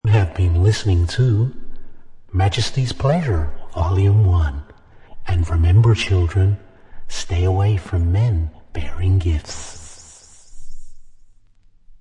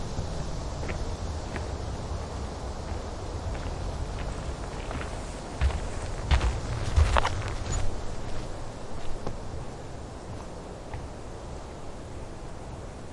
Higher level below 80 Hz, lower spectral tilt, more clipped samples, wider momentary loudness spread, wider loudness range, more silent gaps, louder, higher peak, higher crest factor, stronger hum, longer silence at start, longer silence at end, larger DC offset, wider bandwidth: about the same, -32 dBFS vs -34 dBFS; about the same, -6.5 dB/octave vs -5.5 dB/octave; neither; about the same, 16 LU vs 14 LU; second, 6 LU vs 10 LU; neither; first, -19 LUFS vs -34 LUFS; about the same, -4 dBFS vs -2 dBFS; second, 16 dB vs 28 dB; neither; about the same, 0.05 s vs 0 s; about the same, 0.05 s vs 0 s; neither; about the same, 10.5 kHz vs 11.5 kHz